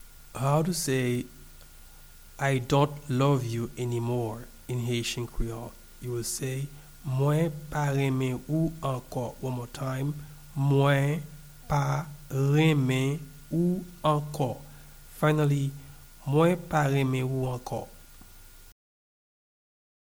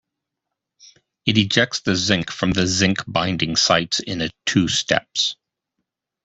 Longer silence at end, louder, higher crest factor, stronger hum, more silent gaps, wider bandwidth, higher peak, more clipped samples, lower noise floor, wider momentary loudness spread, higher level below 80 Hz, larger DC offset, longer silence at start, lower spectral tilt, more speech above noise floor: first, 1.35 s vs 0.9 s; second, -28 LUFS vs -19 LUFS; about the same, 18 dB vs 20 dB; neither; neither; first, over 20 kHz vs 8.4 kHz; second, -10 dBFS vs -2 dBFS; neither; second, -50 dBFS vs -82 dBFS; first, 16 LU vs 6 LU; about the same, -48 dBFS vs -50 dBFS; neither; second, 0.05 s vs 1.25 s; first, -6 dB/octave vs -3.5 dB/octave; second, 23 dB vs 62 dB